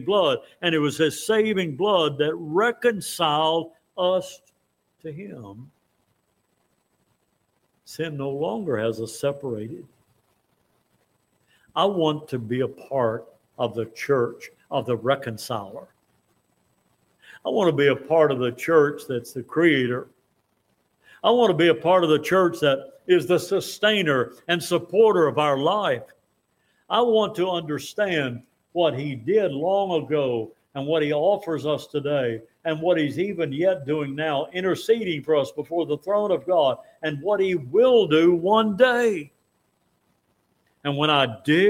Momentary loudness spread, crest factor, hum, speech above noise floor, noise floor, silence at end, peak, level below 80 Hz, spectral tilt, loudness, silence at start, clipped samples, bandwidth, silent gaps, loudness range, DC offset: 12 LU; 20 dB; none; 49 dB; -71 dBFS; 0 s; -4 dBFS; -68 dBFS; -5.5 dB/octave; -23 LUFS; 0 s; under 0.1%; 16.5 kHz; none; 9 LU; under 0.1%